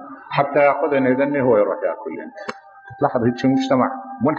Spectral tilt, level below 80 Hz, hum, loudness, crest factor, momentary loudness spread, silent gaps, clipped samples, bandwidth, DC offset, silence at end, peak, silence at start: -7.5 dB/octave; -60 dBFS; none; -19 LUFS; 16 dB; 15 LU; none; under 0.1%; 7.4 kHz; under 0.1%; 0 s; -2 dBFS; 0 s